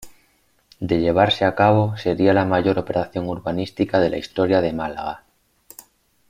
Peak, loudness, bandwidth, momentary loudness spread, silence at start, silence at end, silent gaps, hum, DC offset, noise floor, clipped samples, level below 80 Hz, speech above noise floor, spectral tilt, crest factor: -2 dBFS; -20 LUFS; 16 kHz; 10 LU; 0 s; 1.15 s; none; none; under 0.1%; -62 dBFS; under 0.1%; -50 dBFS; 42 dB; -7 dB/octave; 18 dB